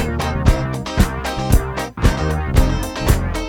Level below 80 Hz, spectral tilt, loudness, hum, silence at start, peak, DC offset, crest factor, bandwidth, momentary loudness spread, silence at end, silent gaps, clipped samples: -20 dBFS; -5.5 dB/octave; -19 LUFS; none; 0 s; 0 dBFS; under 0.1%; 16 dB; 18.5 kHz; 4 LU; 0 s; none; under 0.1%